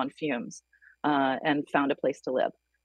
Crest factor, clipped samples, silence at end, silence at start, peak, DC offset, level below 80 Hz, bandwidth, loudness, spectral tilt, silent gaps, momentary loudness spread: 18 dB; under 0.1%; 0.35 s; 0 s; -10 dBFS; under 0.1%; -78 dBFS; 9.8 kHz; -29 LUFS; -5 dB/octave; none; 8 LU